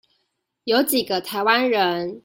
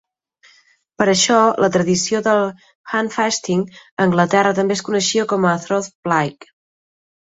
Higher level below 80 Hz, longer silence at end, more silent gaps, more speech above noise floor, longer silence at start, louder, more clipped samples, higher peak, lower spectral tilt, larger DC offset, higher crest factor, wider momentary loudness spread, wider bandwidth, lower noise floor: second, -66 dBFS vs -58 dBFS; second, 0.05 s vs 0.95 s; second, none vs 2.75-2.84 s, 3.91-3.97 s, 5.95-6.03 s; first, 53 dB vs 38 dB; second, 0.65 s vs 1 s; second, -20 LUFS vs -17 LUFS; neither; about the same, -4 dBFS vs -2 dBFS; about the same, -3 dB/octave vs -4 dB/octave; neither; about the same, 18 dB vs 16 dB; about the same, 6 LU vs 8 LU; first, 16.5 kHz vs 8 kHz; first, -74 dBFS vs -55 dBFS